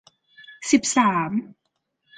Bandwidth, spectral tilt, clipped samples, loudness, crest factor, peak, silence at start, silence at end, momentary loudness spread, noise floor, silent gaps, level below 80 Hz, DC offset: 9.6 kHz; -3.5 dB/octave; under 0.1%; -21 LUFS; 20 dB; -4 dBFS; 0.5 s; 0.75 s; 11 LU; -76 dBFS; none; -66 dBFS; under 0.1%